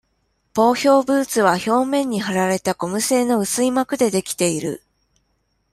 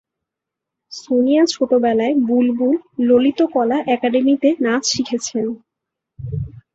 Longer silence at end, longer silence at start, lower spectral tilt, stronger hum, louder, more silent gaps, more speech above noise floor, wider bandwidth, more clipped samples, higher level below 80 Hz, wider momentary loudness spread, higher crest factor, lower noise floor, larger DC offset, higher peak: first, 0.95 s vs 0.15 s; second, 0.55 s vs 0.9 s; about the same, -4 dB/octave vs -4.5 dB/octave; neither; about the same, -19 LUFS vs -17 LUFS; neither; second, 49 dB vs 67 dB; first, 16 kHz vs 8 kHz; neither; second, -60 dBFS vs -50 dBFS; second, 6 LU vs 13 LU; about the same, 16 dB vs 14 dB; second, -68 dBFS vs -83 dBFS; neither; about the same, -2 dBFS vs -2 dBFS